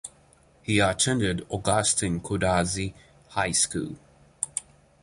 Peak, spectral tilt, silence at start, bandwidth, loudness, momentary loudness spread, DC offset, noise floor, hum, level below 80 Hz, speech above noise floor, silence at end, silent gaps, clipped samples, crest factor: -8 dBFS; -3.5 dB/octave; 0.05 s; 11.5 kHz; -25 LUFS; 13 LU; under 0.1%; -58 dBFS; none; -46 dBFS; 33 dB; 0.4 s; none; under 0.1%; 20 dB